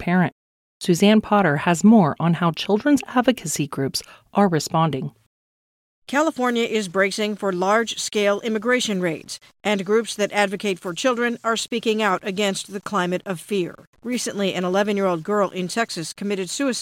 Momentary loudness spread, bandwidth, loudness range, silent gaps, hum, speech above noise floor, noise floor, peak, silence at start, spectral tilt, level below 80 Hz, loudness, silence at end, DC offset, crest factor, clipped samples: 9 LU; 16 kHz; 5 LU; 0.32-0.80 s, 5.26-6.02 s, 13.87-13.93 s; none; over 69 dB; under -90 dBFS; -4 dBFS; 0 s; -5 dB/octave; -62 dBFS; -21 LUFS; 0 s; under 0.1%; 18 dB; under 0.1%